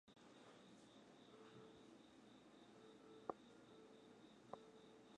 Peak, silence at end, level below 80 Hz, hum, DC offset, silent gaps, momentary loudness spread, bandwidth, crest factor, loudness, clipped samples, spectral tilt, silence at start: -28 dBFS; 0 s; under -90 dBFS; none; under 0.1%; none; 11 LU; 10 kHz; 34 dB; -63 LUFS; under 0.1%; -5 dB/octave; 0.05 s